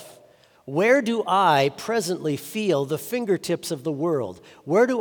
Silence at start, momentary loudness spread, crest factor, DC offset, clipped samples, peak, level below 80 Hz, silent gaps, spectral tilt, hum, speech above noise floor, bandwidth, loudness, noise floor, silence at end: 0 s; 9 LU; 18 dB; under 0.1%; under 0.1%; -6 dBFS; -72 dBFS; none; -5 dB/octave; none; 32 dB; over 20 kHz; -23 LUFS; -54 dBFS; 0 s